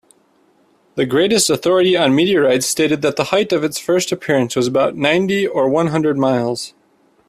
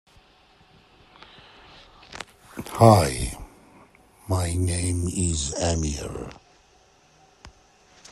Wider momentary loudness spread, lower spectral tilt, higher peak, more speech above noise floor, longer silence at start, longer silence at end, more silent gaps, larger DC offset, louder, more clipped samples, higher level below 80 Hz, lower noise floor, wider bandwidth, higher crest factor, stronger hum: second, 5 LU vs 24 LU; second, -4 dB/octave vs -5.5 dB/octave; about the same, 0 dBFS vs -2 dBFS; first, 41 dB vs 36 dB; second, 0.95 s vs 2.1 s; about the same, 0.6 s vs 0.65 s; neither; neither; first, -16 LUFS vs -23 LUFS; neither; second, -56 dBFS vs -42 dBFS; about the same, -56 dBFS vs -58 dBFS; about the same, 15.5 kHz vs 15.5 kHz; second, 16 dB vs 26 dB; neither